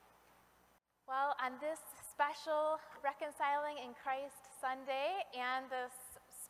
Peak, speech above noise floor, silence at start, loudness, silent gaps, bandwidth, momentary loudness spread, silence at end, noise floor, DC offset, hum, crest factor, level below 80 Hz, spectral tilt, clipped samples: -20 dBFS; 32 dB; 1.1 s; -40 LUFS; none; 15.5 kHz; 10 LU; 0 s; -73 dBFS; under 0.1%; none; 20 dB; -82 dBFS; -1.5 dB/octave; under 0.1%